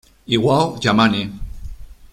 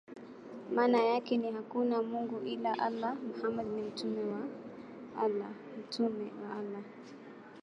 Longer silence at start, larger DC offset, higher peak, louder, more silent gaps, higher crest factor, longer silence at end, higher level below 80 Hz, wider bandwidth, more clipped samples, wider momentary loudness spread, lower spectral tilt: first, 0.3 s vs 0.1 s; neither; first, -2 dBFS vs -18 dBFS; first, -17 LUFS vs -35 LUFS; neither; about the same, 18 dB vs 16 dB; about the same, 0.1 s vs 0 s; first, -36 dBFS vs -78 dBFS; first, 13.5 kHz vs 10 kHz; neither; about the same, 20 LU vs 18 LU; about the same, -5.5 dB/octave vs -6 dB/octave